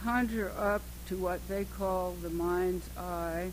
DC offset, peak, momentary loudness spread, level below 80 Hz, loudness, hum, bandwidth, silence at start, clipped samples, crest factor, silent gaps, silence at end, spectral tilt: under 0.1%; -16 dBFS; 6 LU; -44 dBFS; -34 LUFS; 60 Hz at -45 dBFS; 16.5 kHz; 0 s; under 0.1%; 16 dB; none; 0 s; -6 dB/octave